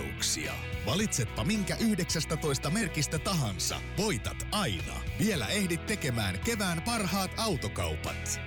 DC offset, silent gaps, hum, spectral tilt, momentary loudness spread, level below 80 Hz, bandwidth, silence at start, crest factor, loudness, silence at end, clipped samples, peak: under 0.1%; none; none; -4 dB/octave; 4 LU; -44 dBFS; over 20 kHz; 0 s; 12 dB; -31 LUFS; 0 s; under 0.1%; -18 dBFS